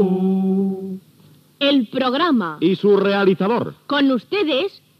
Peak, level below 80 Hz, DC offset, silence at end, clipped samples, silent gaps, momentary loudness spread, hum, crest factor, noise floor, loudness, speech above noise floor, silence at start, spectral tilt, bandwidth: -6 dBFS; -74 dBFS; under 0.1%; 0.3 s; under 0.1%; none; 7 LU; none; 14 dB; -51 dBFS; -18 LUFS; 33 dB; 0 s; -8 dB/octave; 6 kHz